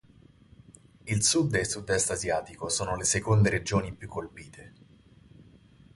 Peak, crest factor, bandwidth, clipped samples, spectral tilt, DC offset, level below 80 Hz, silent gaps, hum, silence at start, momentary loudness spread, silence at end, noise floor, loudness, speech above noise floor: -10 dBFS; 20 dB; 11.5 kHz; under 0.1%; -4 dB/octave; under 0.1%; -50 dBFS; none; none; 1.05 s; 17 LU; 0.55 s; -57 dBFS; -27 LUFS; 29 dB